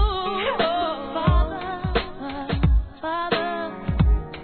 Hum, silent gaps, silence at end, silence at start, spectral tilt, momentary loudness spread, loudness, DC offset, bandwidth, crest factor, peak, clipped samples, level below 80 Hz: none; none; 0 s; 0 s; -10 dB/octave; 7 LU; -24 LUFS; 0.2%; 4.5 kHz; 18 dB; -6 dBFS; under 0.1%; -26 dBFS